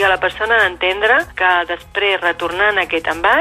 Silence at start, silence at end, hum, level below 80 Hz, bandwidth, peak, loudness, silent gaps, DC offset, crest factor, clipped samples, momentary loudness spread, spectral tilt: 0 s; 0 s; none; -44 dBFS; 14.5 kHz; -2 dBFS; -15 LUFS; none; under 0.1%; 14 dB; under 0.1%; 4 LU; -3.5 dB/octave